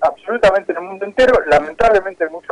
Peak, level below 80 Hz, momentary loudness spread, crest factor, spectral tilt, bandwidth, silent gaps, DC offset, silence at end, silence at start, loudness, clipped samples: -4 dBFS; -38 dBFS; 10 LU; 10 dB; -4.5 dB/octave; 10.5 kHz; none; under 0.1%; 0.1 s; 0 s; -15 LUFS; under 0.1%